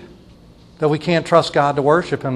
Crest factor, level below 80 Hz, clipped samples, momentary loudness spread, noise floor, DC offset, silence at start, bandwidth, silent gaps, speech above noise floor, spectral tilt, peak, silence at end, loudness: 18 dB; -50 dBFS; under 0.1%; 5 LU; -45 dBFS; under 0.1%; 0 s; 11.5 kHz; none; 29 dB; -6 dB/octave; 0 dBFS; 0 s; -17 LUFS